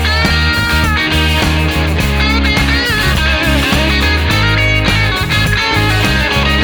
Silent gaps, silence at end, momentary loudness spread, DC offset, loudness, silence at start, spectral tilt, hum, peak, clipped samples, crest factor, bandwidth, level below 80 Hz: none; 0 s; 2 LU; under 0.1%; -11 LUFS; 0 s; -4.5 dB/octave; none; 0 dBFS; under 0.1%; 12 dB; over 20 kHz; -18 dBFS